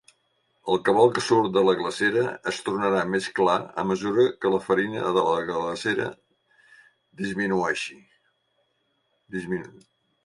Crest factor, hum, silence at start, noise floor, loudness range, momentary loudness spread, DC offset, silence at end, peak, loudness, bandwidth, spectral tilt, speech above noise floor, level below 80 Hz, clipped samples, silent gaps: 20 dB; none; 0.65 s; -72 dBFS; 9 LU; 12 LU; under 0.1%; 0.55 s; -6 dBFS; -24 LUFS; 11.5 kHz; -5 dB/octave; 48 dB; -64 dBFS; under 0.1%; none